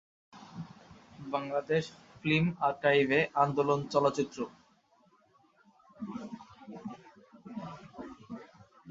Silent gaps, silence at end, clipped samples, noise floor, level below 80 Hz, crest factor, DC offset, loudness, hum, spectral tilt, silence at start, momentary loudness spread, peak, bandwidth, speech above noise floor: none; 0 s; under 0.1%; -67 dBFS; -68 dBFS; 22 dB; under 0.1%; -30 LUFS; none; -6 dB/octave; 0.35 s; 21 LU; -12 dBFS; 7.8 kHz; 37 dB